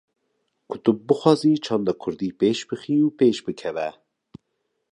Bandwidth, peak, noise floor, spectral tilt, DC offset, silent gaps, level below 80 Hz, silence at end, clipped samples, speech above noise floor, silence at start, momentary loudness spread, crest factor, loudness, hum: 10.5 kHz; -2 dBFS; -76 dBFS; -6.5 dB/octave; under 0.1%; none; -66 dBFS; 1 s; under 0.1%; 54 dB; 0.7 s; 11 LU; 22 dB; -22 LUFS; none